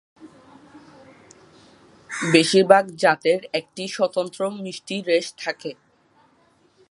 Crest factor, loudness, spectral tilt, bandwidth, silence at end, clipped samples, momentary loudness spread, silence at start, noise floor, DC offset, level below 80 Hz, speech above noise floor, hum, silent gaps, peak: 22 dB; -21 LUFS; -4 dB/octave; 11.5 kHz; 1.2 s; under 0.1%; 16 LU; 0.2 s; -60 dBFS; under 0.1%; -72 dBFS; 39 dB; none; none; 0 dBFS